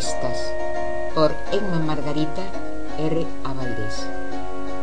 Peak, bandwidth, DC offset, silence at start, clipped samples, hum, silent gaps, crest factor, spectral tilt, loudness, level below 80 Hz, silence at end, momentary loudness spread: -6 dBFS; 10.5 kHz; 10%; 0 s; under 0.1%; 50 Hz at -40 dBFS; none; 20 dB; -5.5 dB/octave; -26 LUFS; -40 dBFS; 0 s; 10 LU